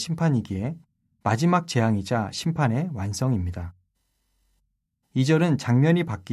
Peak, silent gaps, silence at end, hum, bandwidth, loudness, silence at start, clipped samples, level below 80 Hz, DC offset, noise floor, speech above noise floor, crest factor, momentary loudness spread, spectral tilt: -6 dBFS; none; 0 s; none; 13 kHz; -24 LUFS; 0 s; under 0.1%; -46 dBFS; under 0.1%; -74 dBFS; 51 dB; 18 dB; 11 LU; -6.5 dB/octave